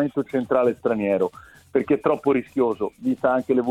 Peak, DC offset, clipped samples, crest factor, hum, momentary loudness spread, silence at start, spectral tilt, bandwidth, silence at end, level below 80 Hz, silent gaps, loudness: -6 dBFS; under 0.1%; under 0.1%; 16 dB; none; 5 LU; 0 s; -8 dB/octave; 12.5 kHz; 0 s; -58 dBFS; none; -23 LUFS